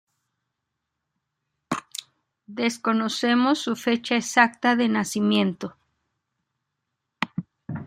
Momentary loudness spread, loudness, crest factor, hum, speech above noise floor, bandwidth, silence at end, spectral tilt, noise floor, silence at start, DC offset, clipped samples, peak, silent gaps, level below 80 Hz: 17 LU; -23 LUFS; 24 dB; none; 59 dB; 15.5 kHz; 0 s; -4 dB/octave; -81 dBFS; 1.7 s; under 0.1%; under 0.1%; -2 dBFS; none; -70 dBFS